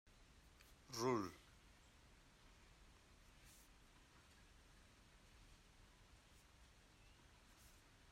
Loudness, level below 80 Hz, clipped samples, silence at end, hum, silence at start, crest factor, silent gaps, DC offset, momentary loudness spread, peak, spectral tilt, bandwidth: -45 LUFS; -72 dBFS; under 0.1%; 0 s; none; 0.05 s; 26 dB; none; under 0.1%; 23 LU; -30 dBFS; -4.5 dB/octave; 16 kHz